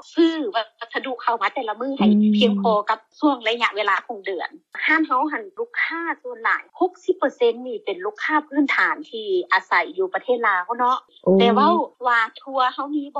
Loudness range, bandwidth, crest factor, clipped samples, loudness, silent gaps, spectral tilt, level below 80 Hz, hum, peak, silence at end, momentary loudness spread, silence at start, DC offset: 3 LU; 7.8 kHz; 16 dB; under 0.1%; -21 LUFS; none; -6 dB/octave; -70 dBFS; none; -6 dBFS; 0 s; 11 LU; 0.15 s; under 0.1%